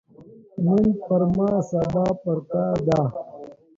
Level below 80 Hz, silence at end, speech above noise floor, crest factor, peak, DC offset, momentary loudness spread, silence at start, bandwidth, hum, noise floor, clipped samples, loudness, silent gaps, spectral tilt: -50 dBFS; 0.25 s; 26 dB; 16 dB; -8 dBFS; under 0.1%; 15 LU; 0.2 s; 7.6 kHz; none; -48 dBFS; under 0.1%; -22 LUFS; none; -9.5 dB/octave